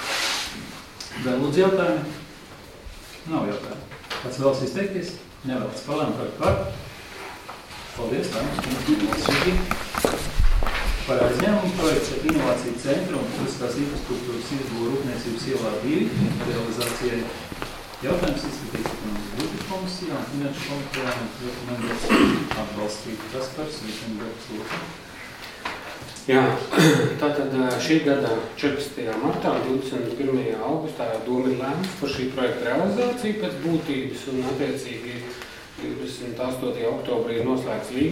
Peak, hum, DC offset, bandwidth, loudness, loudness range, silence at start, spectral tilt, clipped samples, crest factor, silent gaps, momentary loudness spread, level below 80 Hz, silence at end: -2 dBFS; none; under 0.1%; 16.5 kHz; -25 LUFS; 6 LU; 0 s; -5 dB/octave; under 0.1%; 22 dB; none; 14 LU; -36 dBFS; 0 s